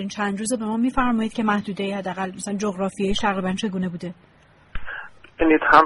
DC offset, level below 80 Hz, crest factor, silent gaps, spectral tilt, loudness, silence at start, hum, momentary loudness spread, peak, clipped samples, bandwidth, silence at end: under 0.1%; -42 dBFS; 22 dB; none; -5 dB/octave; -23 LUFS; 0 s; none; 15 LU; 0 dBFS; under 0.1%; 11.5 kHz; 0 s